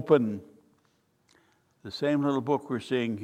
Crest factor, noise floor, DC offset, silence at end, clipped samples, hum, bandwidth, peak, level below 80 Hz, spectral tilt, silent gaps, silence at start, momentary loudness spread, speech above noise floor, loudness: 22 dB; -69 dBFS; under 0.1%; 0 s; under 0.1%; none; 10 kHz; -8 dBFS; -74 dBFS; -7 dB/octave; none; 0 s; 16 LU; 43 dB; -28 LUFS